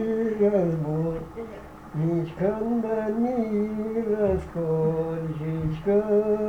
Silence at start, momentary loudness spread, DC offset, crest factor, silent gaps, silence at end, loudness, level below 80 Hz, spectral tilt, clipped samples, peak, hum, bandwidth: 0 s; 8 LU; under 0.1%; 14 dB; none; 0 s; -26 LUFS; -46 dBFS; -9.5 dB/octave; under 0.1%; -12 dBFS; none; 8.4 kHz